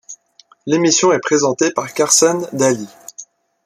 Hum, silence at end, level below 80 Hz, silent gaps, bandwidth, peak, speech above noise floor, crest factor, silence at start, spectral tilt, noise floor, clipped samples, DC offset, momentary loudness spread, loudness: none; 0.4 s; -64 dBFS; none; 15 kHz; 0 dBFS; 36 dB; 16 dB; 0.1 s; -3 dB/octave; -51 dBFS; under 0.1%; under 0.1%; 20 LU; -15 LUFS